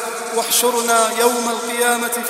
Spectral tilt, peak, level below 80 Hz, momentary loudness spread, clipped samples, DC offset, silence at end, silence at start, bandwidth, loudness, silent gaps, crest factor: -0.5 dB/octave; 0 dBFS; -72 dBFS; 6 LU; under 0.1%; under 0.1%; 0 s; 0 s; 16.5 kHz; -16 LUFS; none; 18 dB